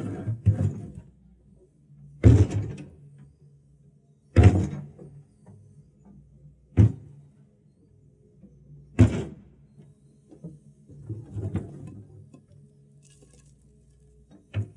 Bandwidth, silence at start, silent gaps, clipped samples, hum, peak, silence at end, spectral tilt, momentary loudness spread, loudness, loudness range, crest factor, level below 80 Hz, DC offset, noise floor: 9.4 kHz; 0 s; none; under 0.1%; none; -4 dBFS; 0.1 s; -8.5 dB/octave; 27 LU; -24 LUFS; 16 LU; 24 dB; -42 dBFS; under 0.1%; -59 dBFS